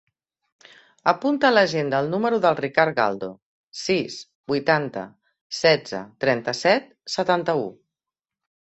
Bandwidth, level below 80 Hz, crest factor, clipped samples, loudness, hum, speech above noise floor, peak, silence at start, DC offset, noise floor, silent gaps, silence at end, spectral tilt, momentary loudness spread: 8.2 kHz; -66 dBFS; 20 dB; under 0.1%; -22 LUFS; none; 67 dB; -2 dBFS; 1.05 s; under 0.1%; -89 dBFS; 3.42-3.67 s, 4.35-4.44 s, 5.41-5.50 s; 0.95 s; -4.5 dB/octave; 14 LU